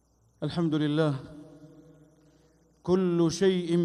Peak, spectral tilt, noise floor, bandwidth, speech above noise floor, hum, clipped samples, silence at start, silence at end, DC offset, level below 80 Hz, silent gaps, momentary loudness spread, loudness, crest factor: -14 dBFS; -6.5 dB/octave; -63 dBFS; 11 kHz; 37 dB; none; under 0.1%; 0.4 s; 0 s; under 0.1%; -62 dBFS; none; 15 LU; -27 LUFS; 16 dB